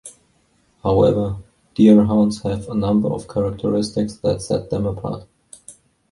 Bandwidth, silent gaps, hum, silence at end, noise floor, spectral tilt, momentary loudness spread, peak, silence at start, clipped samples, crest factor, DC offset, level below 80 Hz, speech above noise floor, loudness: 11.5 kHz; none; none; 0.4 s; -61 dBFS; -7.5 dB/octave; 14 LU; -2 dBFS; 0.05 s; under 0.1%; 18 dB; under 0.1%; -42 dBFS; 43 dB; -19 LUFS